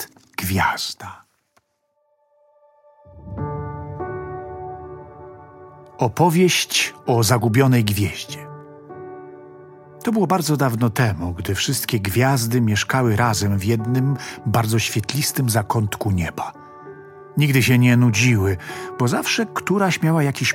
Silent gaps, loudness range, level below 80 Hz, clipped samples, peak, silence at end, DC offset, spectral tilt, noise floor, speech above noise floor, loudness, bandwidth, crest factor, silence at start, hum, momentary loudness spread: none; 14 LU; -50 dBFS; under 0.1%; -2 dBFS; 0 s; under 0.1%; -5 dB/octave; -68 dBFS; 50 dB; -19 LUFS; 17 kHz; 20 dB; 0 s; none; 21 LU